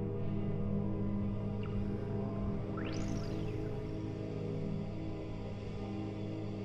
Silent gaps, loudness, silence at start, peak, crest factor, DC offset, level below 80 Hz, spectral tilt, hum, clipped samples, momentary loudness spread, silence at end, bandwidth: none; -39 LUFS; 0 s; -24 dBFS; 14 dB; under 0.1%; -46 dBFS; -8.5 dB/octave; none; under 0.1%; 5 LU; 0 s; 7.6 kHz